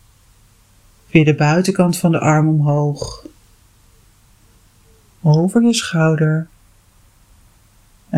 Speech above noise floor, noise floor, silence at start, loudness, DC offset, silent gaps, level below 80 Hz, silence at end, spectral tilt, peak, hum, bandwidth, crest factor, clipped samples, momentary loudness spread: 37 dB; -51 dBFS; 1.15 s; -15 LUFS; under 0.1%; none; -50 dBFS; 0 s; -6.5 dB/octave; 0 dBFS; none; 13.5 kHz; 18 dB; under 0.1%; 10 LU